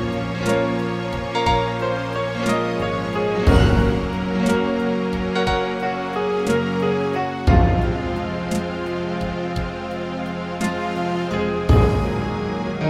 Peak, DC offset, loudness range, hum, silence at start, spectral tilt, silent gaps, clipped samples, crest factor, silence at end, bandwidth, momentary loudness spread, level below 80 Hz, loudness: -2 dBFS; under 0.1%; 5 LU; none; 0 s; -6.5 dB/octave; none; under 0.1%; 18 dB; 0 s; 14.5 kHz; 9 LU; -30 dBFS; -21 LUFS